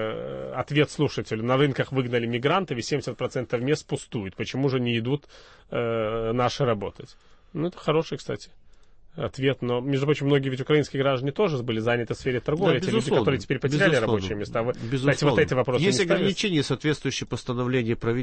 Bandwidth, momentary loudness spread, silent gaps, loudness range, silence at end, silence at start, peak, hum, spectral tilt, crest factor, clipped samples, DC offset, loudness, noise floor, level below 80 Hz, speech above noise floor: 8.8 kHz; 9 LU; none; 5 LU; 0 s; 0 s; -6 dBFS; none; -6 dB/octave; 18 dB; under 0.1%; under 0.1%; -25 LUFS; -50 dBFS; -52 dBFS; 25 dB